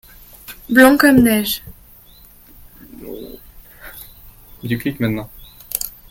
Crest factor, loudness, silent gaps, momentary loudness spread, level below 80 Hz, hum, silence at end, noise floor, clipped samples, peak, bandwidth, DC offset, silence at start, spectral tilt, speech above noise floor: 20 dB; -15 LUFS; none; 26 LU; -44 dBFS; none; 0.2 s; -45 dBFS; under 0.1%; 0 dBFS; 17 kHz; under 0.1%; 0.5 s; -4.5 dB/octave; 31 dB